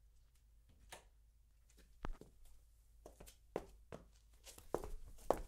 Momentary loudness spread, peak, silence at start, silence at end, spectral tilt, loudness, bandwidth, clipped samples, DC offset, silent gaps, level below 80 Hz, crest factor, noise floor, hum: 21 LU; -16 dBFS; 0.05 s; 0 s; -5 dB/octave; -52 LUFS; 16 kHz; under 0.1%; under 0.1%; none; -58 dBFS; 34 dB; -69 dBFS; none